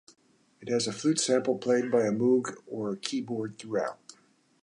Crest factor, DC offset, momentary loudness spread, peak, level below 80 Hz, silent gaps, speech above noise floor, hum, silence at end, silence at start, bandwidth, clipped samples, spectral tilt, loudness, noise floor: 20 dB; under 0.1%; 11 LU; -10 dBFS; -76 dBFS; none; 35 dB; none; 0.65 s; 0.6 s; 11 kHz; under 0.1%; -4.5 dB/octave; -29 LUFS; -63 dBFS